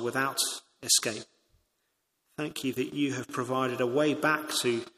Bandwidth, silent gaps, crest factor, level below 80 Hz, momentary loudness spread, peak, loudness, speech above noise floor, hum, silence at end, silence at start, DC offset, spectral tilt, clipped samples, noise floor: 15.5 kHz; none; 20 dB; -74 dBFS; 12 LU; -10 dBFS; -29 LUFS; 49 dB; none; 0.1 s; 0 s; under 0.1%; -2.5 dB/octave; under 0.1%; -78 dBFS